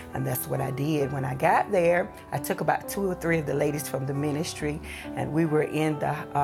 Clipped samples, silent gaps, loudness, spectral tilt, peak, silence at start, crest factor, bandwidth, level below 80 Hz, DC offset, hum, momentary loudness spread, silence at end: under 0.1%; none; -27 LUFS; -6 dB/octave; -10 dBFS; 0 s; 18 dB; 17 kHz; -52 dBFS; under 0.1%; none; 9 LU; 0 s